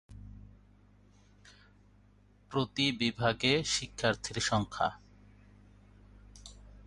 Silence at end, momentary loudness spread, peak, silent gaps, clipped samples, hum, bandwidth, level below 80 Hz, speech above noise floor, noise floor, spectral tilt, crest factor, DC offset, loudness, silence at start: 0.05 s; 24 LU; -14 dBFS; none; under 0.1%; 50 Hz at -55 dBFS; 11.5 kHz; -56 dBFS; 31 dB; -62 dBFS; -3.5 dB/octave; 22 dB; under 0.1%; -31 LUFS; 0.1 s